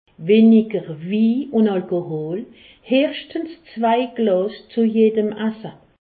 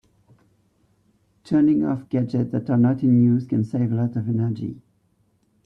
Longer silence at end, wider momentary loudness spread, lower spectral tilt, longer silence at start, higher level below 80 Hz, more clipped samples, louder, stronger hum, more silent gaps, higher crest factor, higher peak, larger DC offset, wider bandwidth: second, 0.35 s vs 0.85 s; first, 15 LU vs 7 LU; about the same, -11.5 dB/octave vs -10.5 dB/octave; second, 0.2 s vs 1.5 s; about the same, -64 dBFS vs -60 dBFS; neither; about the same, -19 LUFS vs -21 LUFS; neither; neither; about the same, 16 dB vs 14 dB; first, -4 dBFS vs -8 dBFS; neither; second, 4.7 kHz vs 5.8 kHz